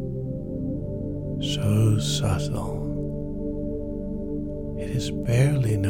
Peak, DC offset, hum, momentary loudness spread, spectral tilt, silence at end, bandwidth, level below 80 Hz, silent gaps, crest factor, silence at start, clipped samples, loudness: -8 dBFS; under 0.1%; 50 Hz at -45 dBFS; 10 LU; -6.5 dB/octave; 0 s; 16 kHz; -36 dBFS; none; 16 dB; 0 s; under 0.1%; -27 LUFS